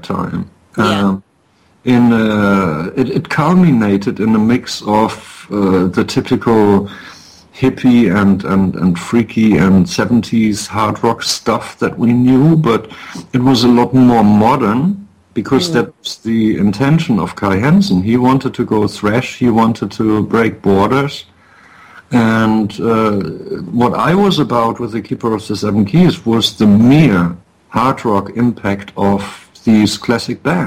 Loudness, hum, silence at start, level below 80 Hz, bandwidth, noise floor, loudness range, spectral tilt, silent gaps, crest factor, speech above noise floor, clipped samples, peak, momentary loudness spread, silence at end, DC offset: -13 LUFS; none; 0.05 s; -44 dBFS; 15.5 kHz; -53 dBFS; 3 LU; -6.5 dB/octave; none; 12 dB; 41 dB; under 0.1%; 0 dBFS; 10 LU; 0 s; under 0.1%